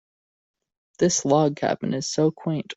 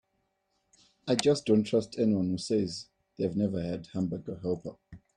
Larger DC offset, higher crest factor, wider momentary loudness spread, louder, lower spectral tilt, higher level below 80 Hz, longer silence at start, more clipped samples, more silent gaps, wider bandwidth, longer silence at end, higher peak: neither; about the same, 20 dB vs 20 dB; second, 6 LU vs 11 LU; first, -23 LUFS vs -30 LUFS; about the same, -5 dB/octave vs -6 dB/octave; about the same, -62 dBFS vs -64 dBFS; about the same, 1 s vs 1.05 s; neither; neither; second, 8.2 kHz vs 11.5 kHz; second, 0.05 s vs 0.2 s; first, -6 dBFS vs -10 dBFS